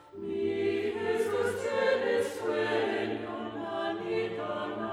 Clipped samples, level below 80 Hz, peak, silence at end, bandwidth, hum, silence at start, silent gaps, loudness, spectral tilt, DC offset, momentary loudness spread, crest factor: under 0.1%; -72 dBFS; -16 dBFS; 0 s; 15.5 kHz; none; 0 s; none; -31 LUFS; -5 dB/octave; under 0.1%; 7 LU; 14 dB